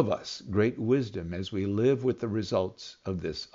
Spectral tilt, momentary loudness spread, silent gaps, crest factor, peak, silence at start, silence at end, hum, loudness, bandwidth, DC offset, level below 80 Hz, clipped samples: -6 dB/octave; 9 LU; none; 18 dB; -10 dBFS; 0 s; 0.1 s; none; -30 LUFS; 7.6 kHz; under 0.1%; -60 dBFS; under 0.1%